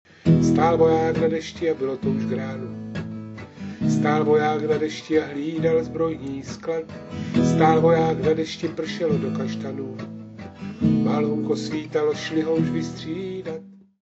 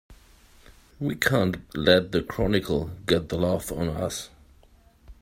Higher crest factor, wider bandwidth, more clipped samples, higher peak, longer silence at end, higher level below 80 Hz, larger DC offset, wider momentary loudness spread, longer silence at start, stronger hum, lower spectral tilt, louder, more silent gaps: second, 18 dB vs 24 dB; second, 8 kHz vs 16 kHz; neither; about the same, -4 dBFS vs -2 dBFS; first, 0.3 s vs 0.1 s; second, -52 dBFS vs -46 dBFS; neither; first, 16 LU vs 11 LU; first, 0.25 s vs 0.1 s; neither; first, -7 dB/octave vs -5 dB/octave; about the same, -23 LUFS vs -25 LUFS; neither